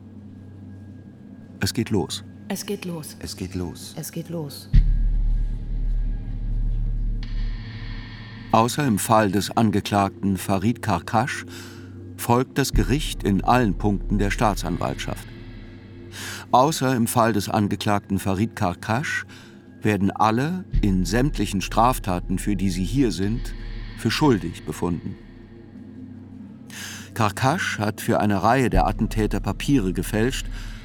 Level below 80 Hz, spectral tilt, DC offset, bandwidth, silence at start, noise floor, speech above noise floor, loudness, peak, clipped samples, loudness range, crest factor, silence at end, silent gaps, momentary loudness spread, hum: -30 dBFS; -5.5 dB/octave; under 0.1%; 19 kHz; 0 s; -44 dBFS; 22 dB; -23 LUFS; -2 dBFS; under 0.1%; 7 LU; 22 dB; 0 s; none; 20 LU; none